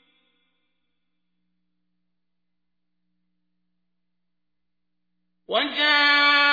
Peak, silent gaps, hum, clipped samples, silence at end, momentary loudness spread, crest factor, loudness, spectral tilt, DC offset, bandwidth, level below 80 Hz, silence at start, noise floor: -6 dBFS; none; 60 Hz at -80 dBFS; under 0.1%; 0 s; 9 LU; 20 dB; -18 LUFS; -1.5 dB/octave; under 0.1%; 5 kHz; -74 dBFS; 5.5 s; -84 dBFS